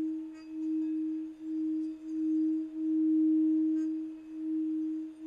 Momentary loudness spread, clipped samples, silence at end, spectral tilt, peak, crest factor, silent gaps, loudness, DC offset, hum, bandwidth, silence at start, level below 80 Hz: 12 LU; under 0.1%; 0 s; -7.5 dB/octave; -22 dBFS; 10 dB; none; -32 LUFS; under 0.1%; none; 2.8 kHz; 0 s; -76 dBFS